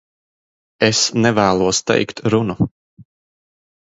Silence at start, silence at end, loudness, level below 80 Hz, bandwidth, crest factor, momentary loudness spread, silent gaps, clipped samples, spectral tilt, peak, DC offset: 0.8 s; 0.85 s; -17 LUFS; -48 dBFS; 8 kHz; 18 dB; 6 LU; 2.71-2.97 s; under 0.1%; -4 dB/octave; 0 dBFS; under 0.1%